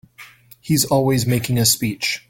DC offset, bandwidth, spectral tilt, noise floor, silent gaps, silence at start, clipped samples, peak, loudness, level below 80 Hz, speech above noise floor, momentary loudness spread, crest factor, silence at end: under 0.1%; 17 kHz; -4 dB/octave; -44 dBFS; none; 0.2 s; under 0.1%; -2 dBFS; -18 LUFS; -48 dBFS; 26 dB; 5 LU; 18 dB; 0.1 s